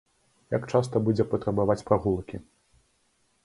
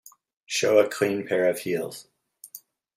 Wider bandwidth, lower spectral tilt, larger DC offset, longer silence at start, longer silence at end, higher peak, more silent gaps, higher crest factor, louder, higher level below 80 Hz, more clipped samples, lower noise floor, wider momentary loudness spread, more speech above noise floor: second, 11.5 kHz vs 16 kHz; first, -8 dB/octave vs -3.5 dB/octave; neither; about the same, 0.5 s vs 0.5 s; first, 1.05 s vs 0.4 s; about the same, -6 dBFS vs -6 dBFS; neither; about the same, 22 dB vs 22 dB; about the same, -26 LUFS vs -24 LUFS; first, -52 dBFS vs -74 dBFS; neither; first, -69 dBFS vs -49 dBFS; second, 8 LU vs 23 LU; first, 44 dB vs 26 dB